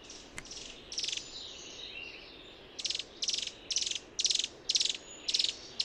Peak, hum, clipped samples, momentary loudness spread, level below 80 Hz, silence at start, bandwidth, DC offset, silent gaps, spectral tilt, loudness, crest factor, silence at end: -14 dBFS; none; under 0.1%; 16 LU; -64 dBFS; 0 s; 15 kHz; under 0.1%; none; 1 dB/octave; -33 LUFS; 24 dB; 0 s